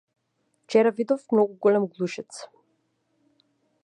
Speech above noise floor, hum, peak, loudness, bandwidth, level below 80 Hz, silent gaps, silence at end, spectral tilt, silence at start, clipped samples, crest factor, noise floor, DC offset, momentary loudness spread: 50 dB; none; -8 dBFS; -23 LUFS; 11 kHz; -80 dBFS; none; 1.4 s; -6 dB/octave; 0.7 s; under 0.1%; 20 dB; -73 dBFS; under 0.1%; 16 LU